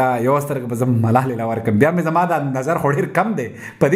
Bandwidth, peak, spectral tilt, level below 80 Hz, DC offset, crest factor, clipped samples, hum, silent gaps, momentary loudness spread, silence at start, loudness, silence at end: 16 kHz; 0 dBFS; -7.5 dB/octave; -56 dBFS; under 0.1%; 16 dB; under 0.1%; none; none; 6 LU; 0 s; -18 LUFS; 0 s